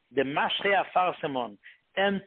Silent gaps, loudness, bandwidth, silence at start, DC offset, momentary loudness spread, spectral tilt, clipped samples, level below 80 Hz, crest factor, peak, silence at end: none; -27 LUFS; 4.4 kHz; 0.1 s; under 0.1%; 10 LU; -8.5 dB/octave; under 0.1%; -70 dBFS; 16 dB; -12 dBFS; 0.05 s